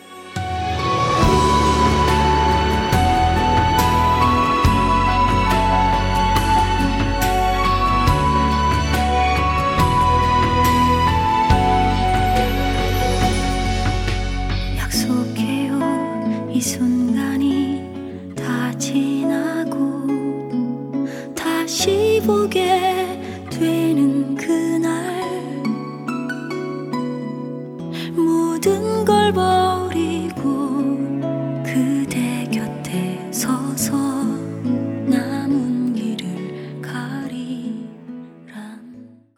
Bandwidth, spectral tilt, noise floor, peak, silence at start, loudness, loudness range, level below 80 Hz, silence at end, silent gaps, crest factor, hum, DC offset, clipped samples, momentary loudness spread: 17.5 kHz; -5.5 dB/octave; -41 dBFS; -4 dBFS; 0 s; -19 LUFS; 7 LU; -28 dBFS; 0.3 s; none; 16 dB; none; under 0.1%; under 0.1%; 11 LU